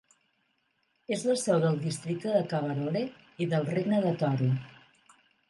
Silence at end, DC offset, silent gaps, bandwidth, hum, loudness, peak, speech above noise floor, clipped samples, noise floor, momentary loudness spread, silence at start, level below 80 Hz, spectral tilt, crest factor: 0.8 s; under 0.1%; none; 11.5 kHz; none; -29 LUFS; -14 dBFS; 46 dB; under 0.1%; -74 dBFS; 8 LU; 1.1 s; -72 dBFS; -6.5 dB/octave; 16 dB